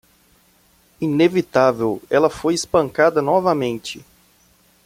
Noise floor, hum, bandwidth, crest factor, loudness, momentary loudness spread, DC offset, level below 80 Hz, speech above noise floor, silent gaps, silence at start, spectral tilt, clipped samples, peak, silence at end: -56 dBFS; none; 16 kHz; 18 dB; -18 LUFS; 10 LU; under 0.1%; -54 dBFS; 39 dB; none; 1 s; -5.5 dB/octave; under 0.1%; -2 dBFS; 0.85 s